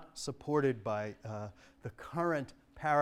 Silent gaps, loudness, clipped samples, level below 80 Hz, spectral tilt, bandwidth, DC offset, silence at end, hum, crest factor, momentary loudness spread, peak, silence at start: none; -36 LUFS; under 0.1%; -64 dBFS; -6 dB/octave; 14.5 kHz; under 0.1%; 0 s; none; 20 dB; 16 LU; -16 dBFS; 0 s